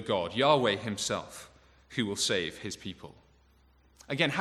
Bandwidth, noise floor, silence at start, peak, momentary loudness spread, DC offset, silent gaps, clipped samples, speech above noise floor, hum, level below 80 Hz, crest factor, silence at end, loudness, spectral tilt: 14.5 kHz; -63 dBFS; 0 s; -10 dBFS; 18 LU; under 0.1%; none; under 0.1%; 33 dB; none; -64 dBFS; 22 dB; 0 s; -30 LUFS; -3.5 dB/octave